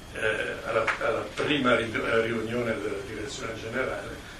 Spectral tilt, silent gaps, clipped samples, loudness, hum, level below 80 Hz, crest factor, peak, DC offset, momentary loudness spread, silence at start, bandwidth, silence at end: -4.5 dB/octave; none; under 0.1%; -28 LUFS; none; -50 dBFS; 18 dB; -10 dBFS; under 0.1%; 10 LU; 0 s; 15 kHz; 0 s